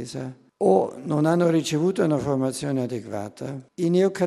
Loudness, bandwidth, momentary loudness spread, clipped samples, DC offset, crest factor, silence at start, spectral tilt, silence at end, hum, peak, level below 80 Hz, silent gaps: -23 LUFS; 13 kHz; 13 LU; under 0.1%; under 0.1%; 18 dB; 0 s; -6.5 dB/octave; 0 s; none; -6 dBFS; -62 dBFS; none